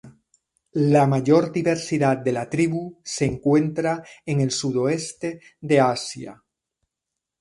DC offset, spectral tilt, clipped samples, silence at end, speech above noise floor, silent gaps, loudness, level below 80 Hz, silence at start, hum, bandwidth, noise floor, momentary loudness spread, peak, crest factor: under 0.1%; -6 dB/octave; under 0.1%; 1.05 s; 63 dB; none; -22 LUFS; -56 dBFS; 0.05 s; none; 11.5 kHz; -84 dBFS; 13 LU; -4 dBFS; 18 dB